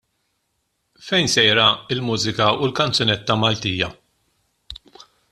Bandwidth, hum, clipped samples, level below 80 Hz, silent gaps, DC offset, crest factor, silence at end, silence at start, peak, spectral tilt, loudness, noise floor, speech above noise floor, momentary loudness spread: 13.5 kHz; none; under 0.1%; -52 dBFS; none; under 0.1%; 20 dB; 0.55 s; 1 s; -2 dBFS; -3.5 dB/octave; -18 LUFS; -72 dBFS; 53 dB; 19 LU